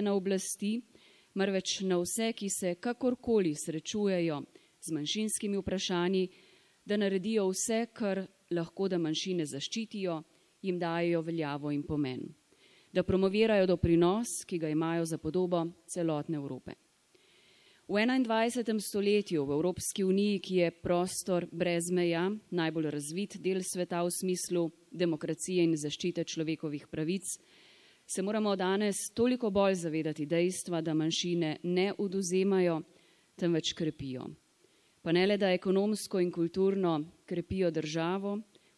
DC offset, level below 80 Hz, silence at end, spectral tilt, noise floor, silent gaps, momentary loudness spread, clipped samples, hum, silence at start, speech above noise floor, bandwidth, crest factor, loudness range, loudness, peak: under 0.1%; -62 dBFS; 0.35 s; -5 dB/octave; -67 dBFS; none; 9 LU; under 0.1%; none; 0 s; 36 dB; 12 kHz; 16 dB; 4 LU; -32 LUFS; -16 dBFS